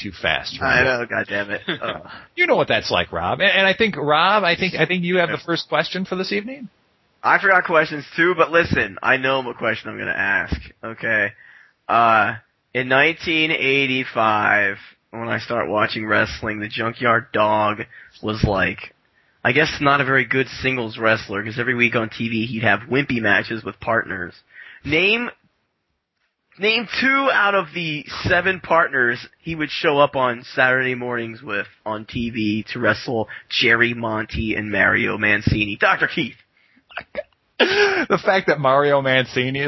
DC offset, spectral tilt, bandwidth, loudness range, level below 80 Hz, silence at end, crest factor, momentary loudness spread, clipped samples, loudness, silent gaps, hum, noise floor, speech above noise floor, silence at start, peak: under 0.1%; -5.5 dB/octave; 6.2 kHz; 3 LU; -44 dBFS; 0 s; 20 dB; 12 LU; under 0.1%; -19 LUFS; none; none; -73 dBFS; 54 dB; 0 s; 0 dBFS